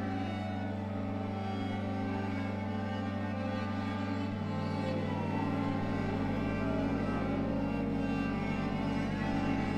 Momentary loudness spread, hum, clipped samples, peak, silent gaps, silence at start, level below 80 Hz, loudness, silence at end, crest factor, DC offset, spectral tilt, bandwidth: 3 LU; none; under 0.1%; -20 dBFS; none; 0 s; -50 dBFS; -35 LUFS; 0 s; 12 dB; under 0.1%; -8 dB/octave; 9.2 kHz